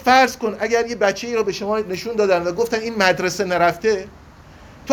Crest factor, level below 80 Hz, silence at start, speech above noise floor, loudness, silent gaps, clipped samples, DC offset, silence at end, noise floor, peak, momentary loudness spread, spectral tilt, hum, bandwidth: 18 dB; -50 dBFS; 0 s; 24 dB; -19 LUFS; none; under 0.1%; under 0.1%; 0 s; -43 dBFS; -2 dBFS; 6 LU; -4 dB/octave; none; 19.5 kHz